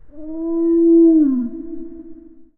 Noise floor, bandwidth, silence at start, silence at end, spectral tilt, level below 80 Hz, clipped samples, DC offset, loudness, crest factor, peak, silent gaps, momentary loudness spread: -39 dBFS; 1.5 kHz; 0.05 s; 0.15 s; -12 dB/octave; -48 dBFS; under 0.1%; under 0.1%; -14 LUFS; 12 dB; -6 dBFS; none; 21 LU